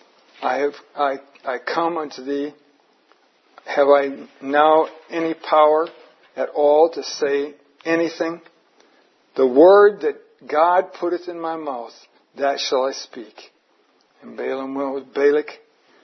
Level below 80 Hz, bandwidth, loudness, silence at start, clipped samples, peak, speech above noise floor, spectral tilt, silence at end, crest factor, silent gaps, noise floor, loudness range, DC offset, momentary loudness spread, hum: -84 dBFS; 6.4 kHz; -19 LUFS; 0.4 s; under 0.1%; -2 dBFS; 42 dB; -4 dB/octave; 0.5 s; 20 dB; none; -61 dBFS; 9 LU; under 0.1%; 17 LU; none